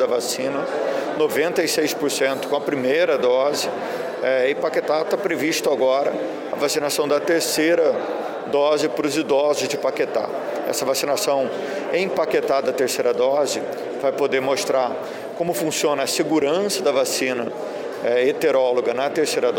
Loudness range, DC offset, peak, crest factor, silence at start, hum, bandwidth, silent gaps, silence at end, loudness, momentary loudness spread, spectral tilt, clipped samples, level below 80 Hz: 2 LU; under 0.1%; -8 dBFS; 12 dB; 0 s; none; 17 kHz; none; 0 s; -21 LUFS; 7 LU; -3 dB/octave; under 0.1%; -68 dBFS